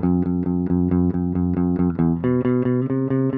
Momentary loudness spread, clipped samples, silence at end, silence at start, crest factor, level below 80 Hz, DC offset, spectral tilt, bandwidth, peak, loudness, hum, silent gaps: 2 LU; under 0.1%; 0 s; 0 s; 12 dB; -46 dBFS; under 0.1%; -13.5 dB/octave; 3.1 kHz; -8 dBFS; -21 LUFS; none; none